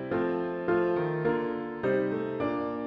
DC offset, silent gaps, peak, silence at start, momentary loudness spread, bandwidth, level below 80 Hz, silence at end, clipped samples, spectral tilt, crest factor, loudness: under 0.1%; none; -16 dBFS; 0 s; 4 LU; 5.4 kHz; -62 dBFS; 0 s; under 0.1%; -9.5 dB/octave; 12 dB; -29 LUFS